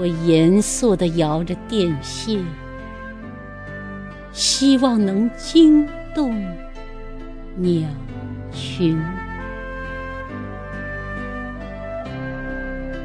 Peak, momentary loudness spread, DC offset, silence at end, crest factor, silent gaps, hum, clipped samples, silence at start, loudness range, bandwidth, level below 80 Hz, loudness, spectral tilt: -4 dBFS; 19 LU; under 0.1%; 0 s; 18 dB; none; none; under 0.1%; 0 s; 12 LU; 11 kHz; -36 dBFS; -20 LUFS; -5 dB/octave